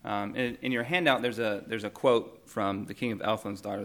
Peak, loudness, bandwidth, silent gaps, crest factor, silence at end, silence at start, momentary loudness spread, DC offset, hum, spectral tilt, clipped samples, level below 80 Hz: -8 dBFS; -30 LUFS; 19 kHz; none; 22 dB; 0 s; 0.05 s; 8 LU; under 0.1%; none; -5.5 dB/octave; under 0.1%; -66 dBFS